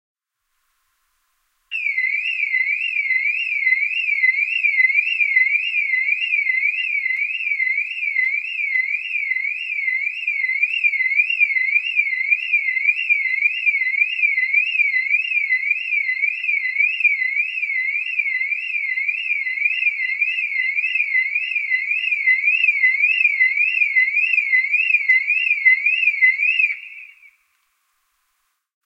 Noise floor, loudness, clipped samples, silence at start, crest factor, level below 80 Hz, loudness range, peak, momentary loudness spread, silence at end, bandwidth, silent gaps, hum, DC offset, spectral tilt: -73 dBFS; -17 LUFS; under 0.1%; 1.7 s; 16 dB; -86 dBFS; 4 LU; -4 dBFS; 6 LU; 1.8 s; 8.6 kHz; none; none; under 0.1%; 7.5 dB/octave